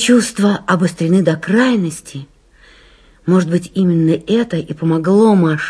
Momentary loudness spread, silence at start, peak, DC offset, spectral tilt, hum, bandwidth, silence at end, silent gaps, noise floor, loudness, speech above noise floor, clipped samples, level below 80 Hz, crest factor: 10 LU; 0 s; 0 dBFS; under 0.1%; -6 dB/octave; none; 11 kHz; 0 s; none; -46 dBFS; -14 LUFS; 33 dB; under 0.1%; -52 dBFS; 14 dB